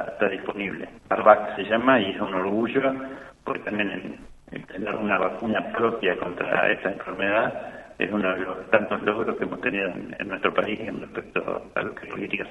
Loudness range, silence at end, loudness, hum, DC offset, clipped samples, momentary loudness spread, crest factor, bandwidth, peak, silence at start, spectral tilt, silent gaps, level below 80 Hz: 5 LU; 0 s; -25 LUFS; none; under 0.1%; under 0.1%; 13 LU; 24 dB; 8.4 kHz; 0 dBFS; 0 s; -7 dB/octave; none; -58 dBFS